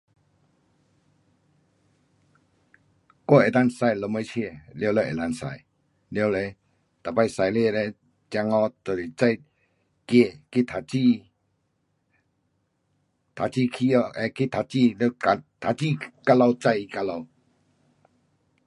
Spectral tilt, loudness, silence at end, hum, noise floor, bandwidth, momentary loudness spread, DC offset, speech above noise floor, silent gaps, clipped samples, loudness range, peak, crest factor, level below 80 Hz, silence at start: -7 dB/octave; -24 LUFS; 1.4 s; none; -73 dBFS; 11.5 kHz; 12 LU; under 0.1%; 49 dB; none; under 0.1%; 5 LU; -2 dBFS; 24 dB; -62 dBFS; 3.3 s